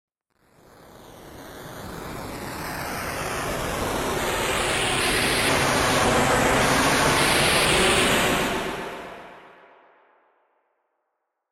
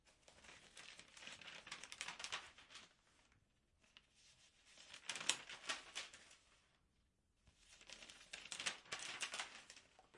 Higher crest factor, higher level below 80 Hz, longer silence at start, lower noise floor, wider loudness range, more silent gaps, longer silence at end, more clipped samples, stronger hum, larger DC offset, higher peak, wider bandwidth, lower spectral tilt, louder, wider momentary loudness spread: second, 18 dB vs 40 dB; first, -42 dBFS vs -82 dBFS; first, 0.95 s vs 0.05 s; about the same, -78 dBFS vs -81 dBFS; first, 13 LU vs 5 LU; neither; first, 2.05 s vs 0 s; neither; neither; neither; first, -6 dBFS vs -14 dBFS; first, 16.5 kHz vs 12 kHz; first, -3 dB/octave vs 1 dB/octave; first, -21 LUFS vs -49 LUFS; second, 19 LU vs 22 LU